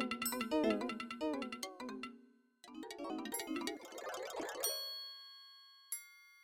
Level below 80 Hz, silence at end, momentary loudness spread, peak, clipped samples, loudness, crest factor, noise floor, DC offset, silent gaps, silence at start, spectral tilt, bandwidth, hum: -76 dBFS; 0 s; 17 LU; -22 dBFS; under 0.1%; -41 LUFS; 20 dB; -65 dBFS; under 0.1%; none; 0 s; -2 dB/octave; 16.5 kHz; none